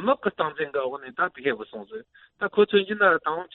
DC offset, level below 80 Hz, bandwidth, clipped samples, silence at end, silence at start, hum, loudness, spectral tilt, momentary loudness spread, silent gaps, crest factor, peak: under 0.1%; -68 dBFS; 4.2 kHz; under 0.1%; 0.1 s; 0 s; none; -24 LUFS; -2 dB/octave; 17 LU; none; 20 dB; -6 dBFS